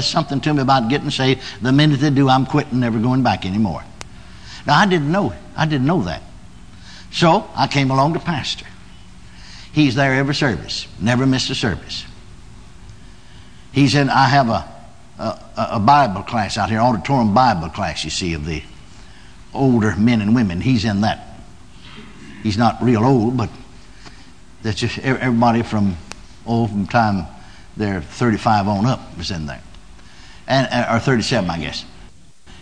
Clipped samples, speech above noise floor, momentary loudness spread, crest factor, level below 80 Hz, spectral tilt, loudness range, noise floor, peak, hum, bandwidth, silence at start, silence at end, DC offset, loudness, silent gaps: under 0.1%; 28 dB; 15 LU; 18 dB; -42 dBFS; -6 dB/octave; 4 LU; -45 dBFS; 0 dBFS; none; 10 kHz; 0 s; 0.55 s; 0.9%; -18 LUFS; none